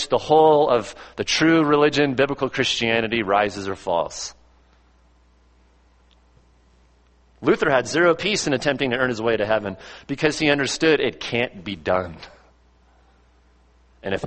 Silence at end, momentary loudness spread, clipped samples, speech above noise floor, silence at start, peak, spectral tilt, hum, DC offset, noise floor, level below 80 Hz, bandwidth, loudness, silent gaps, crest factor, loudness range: 0 s; 13 LU; under 0.1%; 36 dB; 0 s; -2 dBFS; -4 dB/octave; none; under 0.1%; -57 dBFS; -52 dBFS; 8.8 kHz; -20 LUFS; none; 20 dB; 10 LU